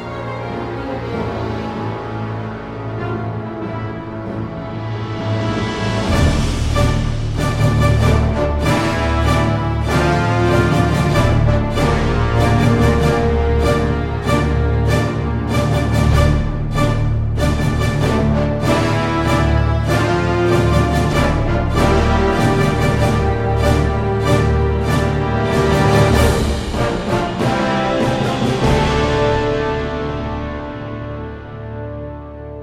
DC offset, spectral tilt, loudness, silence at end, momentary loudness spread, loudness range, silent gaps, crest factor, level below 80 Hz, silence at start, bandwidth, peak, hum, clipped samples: under 0.1%; -6.5 dB/octave; -17 LUFS; 0 s; 11 LU; 8 LU; none; 14 dB; -24 dBFS; 0 s; 15 kHz; -2 dBFS; none; under 0.1%